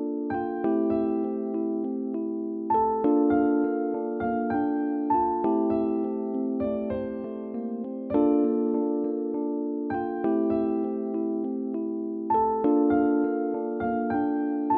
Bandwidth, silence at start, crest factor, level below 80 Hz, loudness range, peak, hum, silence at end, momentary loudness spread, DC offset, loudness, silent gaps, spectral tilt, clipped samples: 3.8 kHz; 0 s; 14 dB; -58 dBFS; 2 LU; -12 dBFS; none; 0 s; 8 LU; under 0.1%; -27 LUFS; none; -8 dB/octave; under 0.1%